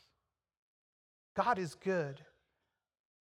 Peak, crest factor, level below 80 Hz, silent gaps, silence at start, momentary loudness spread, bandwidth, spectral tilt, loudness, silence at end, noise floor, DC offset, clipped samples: -16 dBFS; 24 dB; -78 dBFS; none; 1.35 s; 10 LU; 13 kHz; -6 dB/octave; -36 LUFS; 1.05 s; -86 dBFS; under 0.1%; under 0.1%